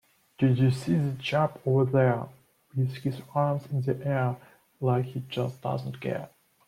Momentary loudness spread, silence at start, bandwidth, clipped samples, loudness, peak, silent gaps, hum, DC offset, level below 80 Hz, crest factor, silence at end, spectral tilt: 10 LU; 0.4 s; 11.5 kHz; under 0.1%; -28 LUFS; -12 dBFS; none; none; under 0.1%; -64 dBFS; 16 dB; 0.4 s; -8 dB/octave